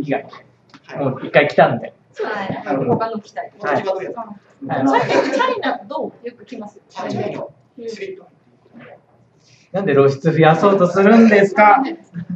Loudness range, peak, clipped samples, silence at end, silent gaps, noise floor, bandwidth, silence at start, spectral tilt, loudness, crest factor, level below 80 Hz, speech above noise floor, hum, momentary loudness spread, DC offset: 16 LU; 0 dBFS; under 0.1%; 0 s; none; -54 dBFS; 8 kHz; 0 s; -7 dB/octave; -16 LUFS; 18 dB; -64 dBFS; 37 dB; none; 22 LU; under 0.1%